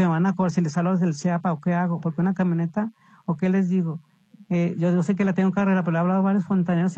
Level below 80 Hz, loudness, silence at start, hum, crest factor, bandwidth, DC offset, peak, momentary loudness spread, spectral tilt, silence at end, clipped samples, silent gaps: -64 dBFS; -23 LUFS; 0 s; none; 12 dB; 8 kHz; under 0.1%; -10 dBFS; 6 LU; -8.5 dB/octave; 0 s; under 0.1%; none